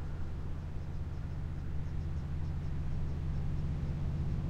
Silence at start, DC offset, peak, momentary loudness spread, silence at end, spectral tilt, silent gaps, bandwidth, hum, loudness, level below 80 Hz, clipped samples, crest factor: 0 s; under 0.1%; -24 dBFS; 5 LU; 0 s; -8.5 dB/octave; none; 7.4 kHz; none; -39 LUFS; -40 dBFS; under 0.1%; 12 dB